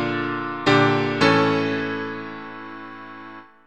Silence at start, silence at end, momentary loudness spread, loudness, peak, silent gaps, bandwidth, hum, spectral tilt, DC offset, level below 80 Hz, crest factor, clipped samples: 0 s; 0.25 s; 20 LU; -20 LUFS; -2 dBFS; none; 9.4 kHz; none; -6 dB/octave; 0.4%; -62 dBFS; 20 dB; under 0.1%